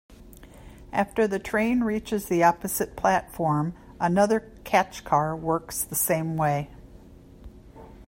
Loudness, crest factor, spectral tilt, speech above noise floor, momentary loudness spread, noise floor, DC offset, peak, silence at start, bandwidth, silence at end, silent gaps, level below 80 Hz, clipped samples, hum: -25 LUFS; 20 dB; -5 dB/octave; 24 dB; 7 LU; -48 dBFS; under 0.1%; -6 dBFS; 0.1 s; 16.5 kHz; 0.05 s; none; -50 dBFS; under 0.1%; none